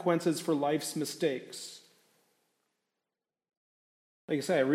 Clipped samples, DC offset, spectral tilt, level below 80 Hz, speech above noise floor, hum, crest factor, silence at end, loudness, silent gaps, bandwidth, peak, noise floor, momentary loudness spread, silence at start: under 0.1%; under 0.1%; -5 dB/octave; -86 dBFS; over 60 dB; none; 18 dB; 0 s; -32 LUFS; 3.57-4.28 s; 16 kHz; -16 dBFS; under -90 dBFS; 14 LU; 0 s